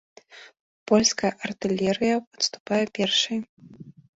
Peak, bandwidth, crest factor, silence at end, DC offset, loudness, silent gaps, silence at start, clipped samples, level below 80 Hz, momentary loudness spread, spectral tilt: -6 dBFS; 8 kHz; 20 dB; 0.25 s; under 0.1%; -24 LUFS; 0.60-0.86 s, 2.27-2.31 s, 2.60-2.65 s, 3.49-3.57 s; 0.35 s; under 0.1%; -62 dBFS; 10 LU; -3 dB/octave